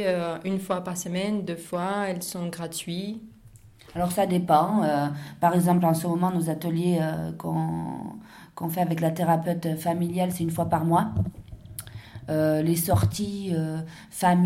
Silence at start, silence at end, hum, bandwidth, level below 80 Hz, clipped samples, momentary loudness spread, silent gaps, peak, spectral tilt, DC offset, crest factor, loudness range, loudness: 0 s; 0 s; none; 16.5 kHz; -52 dBFS; under 0.1%; 14 LU; none; -8 dBFS; -6.5 dB/octave; under 0.1%; 18 dB; 6 LU; -26 LUFS